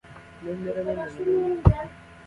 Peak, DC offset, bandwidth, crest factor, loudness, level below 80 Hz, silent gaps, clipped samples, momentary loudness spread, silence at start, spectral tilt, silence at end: -2 dBFS; under 0.1%; 10 kHz; 24 dB; -26 LUFS; -34 dBFS; none; under 0.1%; 16 LU; 0.05 s; -9.5 dB/octave; 0.05 s